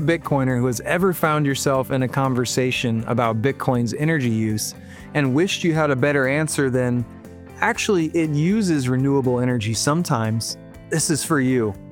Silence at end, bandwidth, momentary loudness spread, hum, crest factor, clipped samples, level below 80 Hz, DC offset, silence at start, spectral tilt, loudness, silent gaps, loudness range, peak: 0 s; 18 kHz; 6 LU; none; 18 dB; under 0.1%; -50 dBFS; under 0.1%; 0 s; -5 dB/octave; -21 LUFS; none; 1 LU; -2 dBFS